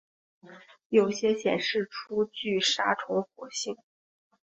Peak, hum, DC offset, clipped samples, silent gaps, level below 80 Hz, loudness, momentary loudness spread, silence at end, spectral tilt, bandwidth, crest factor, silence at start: -10 dBFS; none; under 0.1%; under 0.1%; 0.86-0.90 s; -74 dBFS; -28 LUFS; 10 LU; 0.75 s; -3 dB/octave; 8.2 kHz; 20 dB; 0.45 s